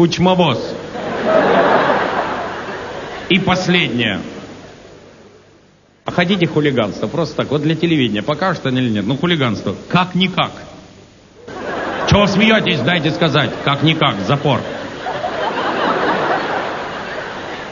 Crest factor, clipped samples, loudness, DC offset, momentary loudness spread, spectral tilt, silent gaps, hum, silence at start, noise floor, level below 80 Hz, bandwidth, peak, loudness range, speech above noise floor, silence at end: 16 dB; under 0.1%; -16 LUFS; under 0.1%; 13 LU; -6 dB/octave; none; none; 0 s; -50 dBFS; -44 dBFS; 7.4 kHz; 0 dBFS; 4 LU; 35 dB; 0 s